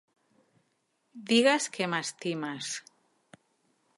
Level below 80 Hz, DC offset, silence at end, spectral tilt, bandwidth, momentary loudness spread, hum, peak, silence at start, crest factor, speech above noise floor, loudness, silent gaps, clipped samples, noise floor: -84 dBFS; under 0.1%; 1.2 s; -3 dB/octave; 11.5 kHz; 14 LU; none; -10 dBFS; 1.15 s; 24 dB; 47 dB; -29 LUFS; none; under 0.1%; -76 dBFS